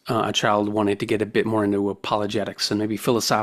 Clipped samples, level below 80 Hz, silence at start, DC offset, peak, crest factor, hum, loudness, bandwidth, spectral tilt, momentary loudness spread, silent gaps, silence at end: under 0.1%; -58 dBFS; 0.05 s; under 0.1%; -4 dBFS; 18 dB; none; -22 LUFS; 16 kHz; -4.5 dB/octave; 4 LU; none; 0 s